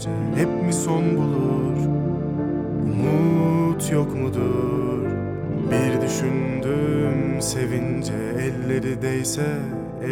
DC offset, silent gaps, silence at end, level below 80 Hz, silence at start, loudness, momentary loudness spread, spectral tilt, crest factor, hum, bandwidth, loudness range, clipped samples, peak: under 0.1%; none; 0 s; -44 dBFS; 0 s; -23 LUFS; 5 LU; -6.5 dB/octave; 14 dB; none; 17 kHz; 2 LU; under 0.1%; -8 dBFS